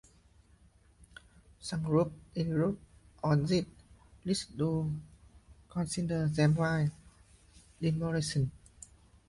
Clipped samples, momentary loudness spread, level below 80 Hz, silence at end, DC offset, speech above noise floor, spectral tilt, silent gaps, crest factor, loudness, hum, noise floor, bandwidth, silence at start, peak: under 0.1%; 16 LU; -58 dBFS; 0.7 s; under 0.1%; 32 dB; -6.5 dB/octave; none; 20 dB; -33 LUFS; none; -63 dBFS; 11.5 kHz; 1.6 s; -14 dBFS